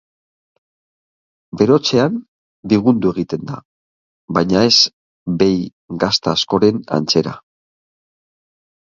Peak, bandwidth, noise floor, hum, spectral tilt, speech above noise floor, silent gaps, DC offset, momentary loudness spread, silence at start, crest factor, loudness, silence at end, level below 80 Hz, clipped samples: 0 dBFS; 7.6 kHz; under -90 dBFS; none; -5 dB/octave; over 75 dB; 2.28-2.63 s, 3.65-4.28 s, 4.93-5.26 s, 5.73-5.88 s; under 0.1%; 17 LU; 1.55 s; 18 dB; -16 LUFS; 1.55 s; -50 dBFS; under 0.1%